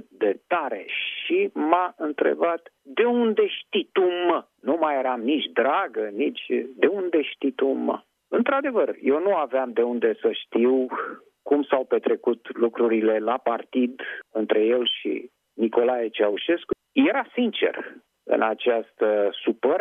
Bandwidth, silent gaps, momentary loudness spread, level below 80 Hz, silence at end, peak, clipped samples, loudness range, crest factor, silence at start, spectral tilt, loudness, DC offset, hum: 3.8 kHz; none; 7 LU; -72 dBFS; 0 s; -2 dBFS; under 0.1%; 1 LU; 20 dB; 0.2 s; -7 dB/octave; -24 LUFS; under 0.1%; none